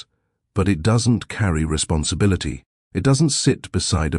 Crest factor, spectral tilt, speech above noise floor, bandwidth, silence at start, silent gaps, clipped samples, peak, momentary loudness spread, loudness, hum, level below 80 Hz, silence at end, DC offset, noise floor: 14 dB; -5 dB/octave; 53 dB; 12 kHz; 0.55 s; 2.66-2.91 s; under 0.1%; -6 dBFS; 9 LU; -20 LUFS; none; -34 dBFS; 0 s; under 0.1%; -72 dBFS